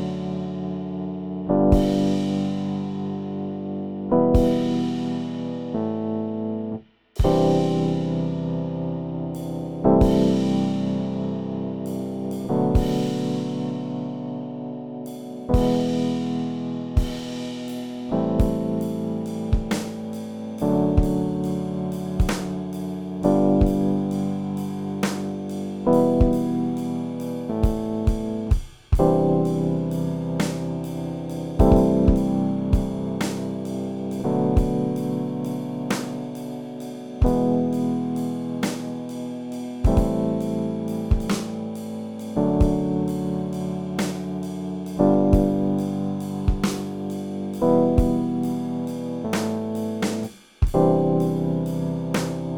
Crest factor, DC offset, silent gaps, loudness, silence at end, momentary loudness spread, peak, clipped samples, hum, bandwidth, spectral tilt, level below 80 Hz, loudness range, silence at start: 22 dB; 0.2%; none; -24 LUFS; 0 s; 11 LU; -2 dBFS; under 0.1%; none; 19 kHz; -7.5 dB/octave; -32 dBFS; 4 LU; 0 s